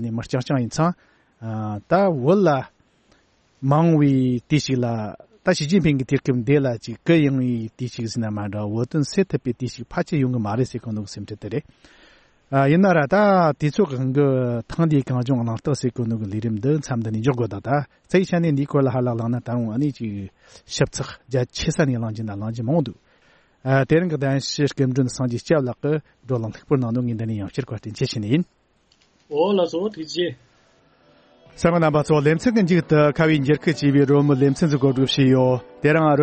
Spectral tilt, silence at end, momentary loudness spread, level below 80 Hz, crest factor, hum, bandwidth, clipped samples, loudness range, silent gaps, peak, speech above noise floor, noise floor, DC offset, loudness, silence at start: -7 dB/octave; 0 s; 12 LU; -52 dBFS; 16 dB; none; 8.8 kHz; under 0.1%; 7 LU; none; -4 dBFS; 41 dB; -61 dBFS; under 0.1%; -21 LUFS; 0 s